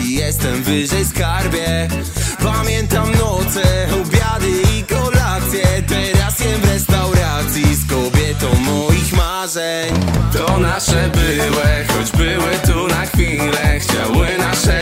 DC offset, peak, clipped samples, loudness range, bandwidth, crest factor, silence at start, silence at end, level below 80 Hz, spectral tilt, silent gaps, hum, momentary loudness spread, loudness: under 0.1%; 0 dBFS; under 0.1%; 1 LU; 16.5 kHz; 14 dB; 0 s; 0 s; -22 dBFS; -4.5 dB/octave; none; none; 3 LU; -15 LUFS